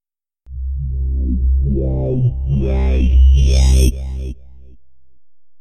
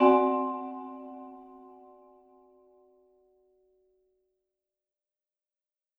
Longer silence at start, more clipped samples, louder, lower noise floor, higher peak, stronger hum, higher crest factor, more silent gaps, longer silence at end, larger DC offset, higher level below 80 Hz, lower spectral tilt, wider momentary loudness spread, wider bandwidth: first, 0.5 s vs 0 s; neither; first, -16 LUFS vs -29 LUFS; second, -68 dBFS vs -90 dBFS; first, 0 dBFS vs -8 dBFS; neither; second, 14 dB vs 24 dB; neither; second, 0 s vs 4.55 s; neither; first, -16 dBFS vs -76 dBFS; about the same, -7 dB/octave vs -7 dB/octave; second, 16 LU vs 28 LU; first, 12 kHz vs 4.5 kHz